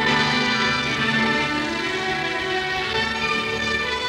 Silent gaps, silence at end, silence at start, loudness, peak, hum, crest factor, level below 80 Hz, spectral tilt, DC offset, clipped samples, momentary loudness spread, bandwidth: none; 0 s; 0 s; -21 LUFS; -6 dBFS; none; 16 dB; -46 dBFS; -3.5 dB/octave; under 0.1%; under 0.1%; 4 LU; 17 kHz